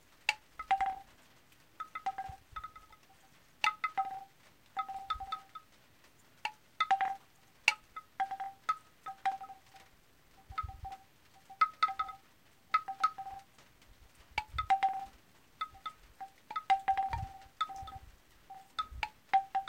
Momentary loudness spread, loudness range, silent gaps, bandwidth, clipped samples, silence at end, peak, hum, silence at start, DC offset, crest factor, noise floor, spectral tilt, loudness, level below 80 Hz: 20 LU; 4 LU; none; 16.5 kHz; under 0.1%; 0 s; -6 dBFS; none; 0.3 s; under 0.1%; 32 dB; -66 dBFS; -1.5 dB/octave; -36 LUFS; -60 dBFS